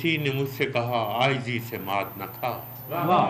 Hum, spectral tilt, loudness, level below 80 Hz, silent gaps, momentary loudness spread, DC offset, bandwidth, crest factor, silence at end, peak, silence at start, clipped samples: none; -6 dB/octave; -27 LUFS; -62 dBFS; none; 8 LU; under 0.1%; 15.5 kHz; 16 dB; 0 s; -10 dBFS; 0 s; under 0.1%